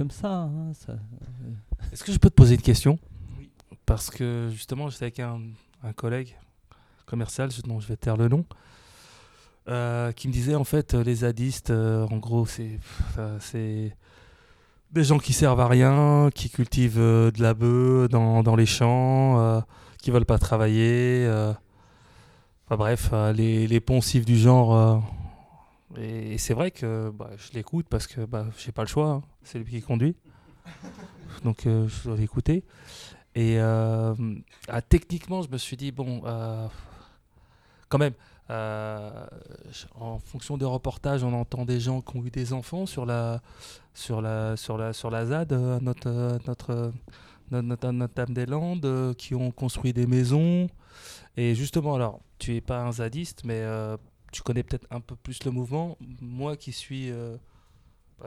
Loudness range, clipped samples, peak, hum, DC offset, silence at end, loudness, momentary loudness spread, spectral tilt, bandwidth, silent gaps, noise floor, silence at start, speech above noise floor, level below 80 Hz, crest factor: 11 LU; under 0.1%; 0 dBFS; none; under 0.1%; 0 s; -25 LUFS; 19 LU; -7 dB/octave; 14 kHz; none; -59 dBFS; 0 s; 35 dB; -40 dBFS; 24 dB